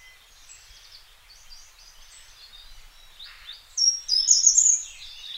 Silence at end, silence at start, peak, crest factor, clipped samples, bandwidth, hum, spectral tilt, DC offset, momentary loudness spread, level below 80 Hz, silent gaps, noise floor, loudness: 0 s; 2.7 s; -2 dBFS; 24 dB; under 0.1%; 16 kHz; none; 5.5 dB/octave; under 0.1%; 27 LU; -54 dBFS; none; -51 dBFS; -18 LUFS